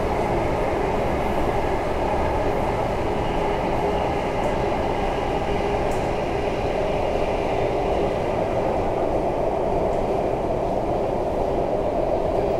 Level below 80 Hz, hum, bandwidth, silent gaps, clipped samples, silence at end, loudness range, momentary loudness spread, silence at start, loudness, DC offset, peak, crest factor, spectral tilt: -32 dBFS; none; 15 kHz; none; under 0.1%; 0 s; 1 LU; 1 LU; 0 s; -23 LUFS; 0.2%; -8 dBFS; 14 dB; -7 dB/octave